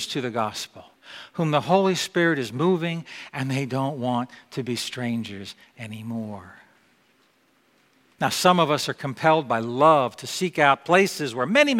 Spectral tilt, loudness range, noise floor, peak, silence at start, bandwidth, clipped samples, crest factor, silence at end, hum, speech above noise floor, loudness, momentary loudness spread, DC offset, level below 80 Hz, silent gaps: -4.5 dB/octave; 12 LU; -63 dBFS; -2 dBFS; 0 s; 16.5 kHz; under 0.1%; 22 dB; 0 s; none; 40 dB; -23 LUFS; 17 LU; under 0.1%; -68 dBFS; none